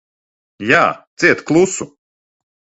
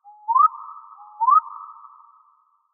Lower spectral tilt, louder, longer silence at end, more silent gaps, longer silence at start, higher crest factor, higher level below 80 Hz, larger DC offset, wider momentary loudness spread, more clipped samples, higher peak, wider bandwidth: first, -4.5 dB/octave vs 14 dB/octave; first, -14 LUFS vs -19 LUFS; second, 0.9 s vs 1.05 s; first, 1.07-1.17 s vs none; first, 0.6 s vs 0.3 s; about the same, 18 dB vs 16 dB; first, -56 dBFS vs under -90 dBFS; neither; second, 13 LU vs 23 LU; neither; first, 0 dBFS vs -8 dBFS; first, 8.2 kHz vs 1.9 kHz